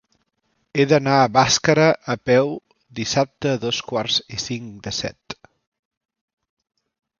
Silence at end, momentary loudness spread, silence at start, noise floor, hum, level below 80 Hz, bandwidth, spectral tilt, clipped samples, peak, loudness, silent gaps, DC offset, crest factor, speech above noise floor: 1.85 s; 15 LU; 0.75 s; -70 dBFS; none; -54 dBFS; 7.4 kHz; -4 dB/octave; under 0.1%; 0 dBFS; -20 LUFS; none; under 0.1%; 20 dB; 51 dB